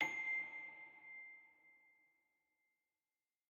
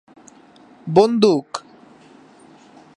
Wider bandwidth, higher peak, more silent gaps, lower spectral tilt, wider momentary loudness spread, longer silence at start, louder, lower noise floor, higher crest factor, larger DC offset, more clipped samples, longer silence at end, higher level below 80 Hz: about the same, 9.6 kHz vs 10.5 kHz; second, -26 dBFS vs 0 dBFS; neither; second, -2 dB/octave vs -6.5 dB/octave; about the same, 20 LU vs 18 LU; second, 0 s vs 0.85 s; second, -45 LUFS vs -16 LUFS; first, under -90 dBFS vs -48 dBFS; about the same, 24 dB vs 20 dB; neither; neither; first, 1.75 s vs 1.4 s; second, under -90 dBFS vs -68 dBFS